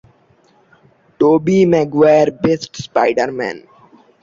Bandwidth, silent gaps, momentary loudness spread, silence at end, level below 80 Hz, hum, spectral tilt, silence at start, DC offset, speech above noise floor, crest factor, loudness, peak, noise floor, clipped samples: 7.6 kHz; none; 11 LU; 0.6 s; -54 dBFS; none; -6.5 dB/octave; 1.2 s; under 0.1%; 39 dB; 16 dB; -14 LUFS; 0 dBFS; -53 dBFS; under 0.1%